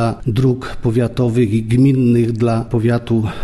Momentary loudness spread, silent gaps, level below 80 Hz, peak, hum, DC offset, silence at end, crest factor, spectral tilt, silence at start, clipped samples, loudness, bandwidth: 5 LU; none; -36 dBFS; -4 dBFS; none; under 0.1%; 0 s; 12 dB; -8.5 dB/octave; 0 s; under 0.1%; -16 LUFS; 12 kHz